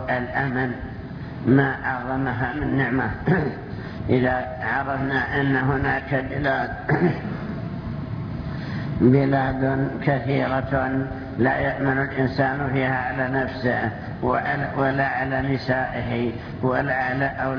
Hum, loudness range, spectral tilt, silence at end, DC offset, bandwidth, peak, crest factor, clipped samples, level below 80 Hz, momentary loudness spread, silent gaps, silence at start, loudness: none; 1 LU; -9.5 dB/octave; 0 s; under 0.1%; 5.4 kHz; -4 dBFS; 18 dB; under 0.1%; -42 dBFS; 9 LU; none; 0 s; -23 LUFS